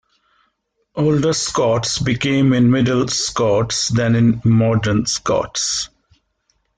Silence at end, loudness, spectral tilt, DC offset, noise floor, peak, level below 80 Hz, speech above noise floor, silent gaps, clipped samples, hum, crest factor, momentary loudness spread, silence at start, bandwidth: 0.9 s; -17 LUFS; -5 dB/octave; under 0.1%; -68 dBFS; -4 dBFS; -46 dBFS; 52 dB; none; under 0.1%; none; 12 dB; 5 LU; 0.95 s; 9.6 kHz